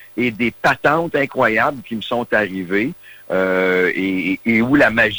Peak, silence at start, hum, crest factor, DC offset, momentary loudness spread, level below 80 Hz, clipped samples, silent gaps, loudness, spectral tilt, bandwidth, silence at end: -4 dBFS; 0 s; none; 14 dB; under 0.1%; 9 LU; -50 dBFS; under 0.1%; none; -17 LUFS; -6 dB/octave; over 20 kHz; 0 s